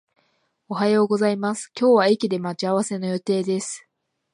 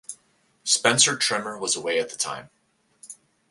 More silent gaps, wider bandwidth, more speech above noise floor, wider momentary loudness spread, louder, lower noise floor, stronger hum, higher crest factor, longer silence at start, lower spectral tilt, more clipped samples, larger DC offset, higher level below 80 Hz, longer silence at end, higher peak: neither; about the same, 11 kHz vs 12 kHz; about the same, 47 dB vs 44 dB; second, 10 LU vs 26 LU; about the same, -22 LUFS vs -22 LUFS; about the same, -68 dBFS vs -67 dBFS; neither; second, 18 dB vs 24 dB; first, 0.7 s vs 0.1 s; first, -5 dB/octave vs -1 dB/octave; neither; neither; about the same, -74 dBFS vs -70 dBFS; first, 0.55 s vs 0.4 s; about the same, -4 dBFS vs -2 dBFS